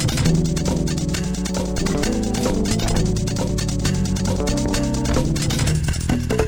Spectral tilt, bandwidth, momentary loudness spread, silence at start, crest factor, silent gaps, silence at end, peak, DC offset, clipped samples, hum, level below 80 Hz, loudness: -5 dB/octave; over 20 kHz; 3 LU; 0 s; 16 dB; none; 0 s; -4 dBFS; 0.4%; under 0.1%; none; -26 dBFS; -21 LUFS